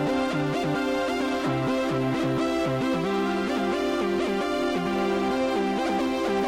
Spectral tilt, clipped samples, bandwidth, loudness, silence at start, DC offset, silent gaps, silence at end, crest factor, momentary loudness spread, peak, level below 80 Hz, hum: -6 dB/octave; under 0.1%; 16 kHz; -26 LUFS; 0 s; under 0.1%; none; 0 s; 8 dB; 1 LU; -16 dBFS; -52 dBFS; none